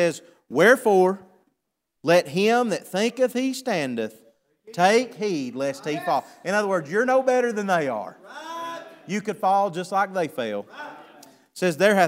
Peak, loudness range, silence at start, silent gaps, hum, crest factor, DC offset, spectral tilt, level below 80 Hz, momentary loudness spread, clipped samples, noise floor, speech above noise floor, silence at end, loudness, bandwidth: -4 dBFS; 5 LU; 0 s; none; none; 20 dB; under 0.1%; -4.5 dB/octave; -78 dBFS; 16 LU; under 0.1%; -80 dBFS; 57 dB; 0 s; -23 LUFS; 16 kHz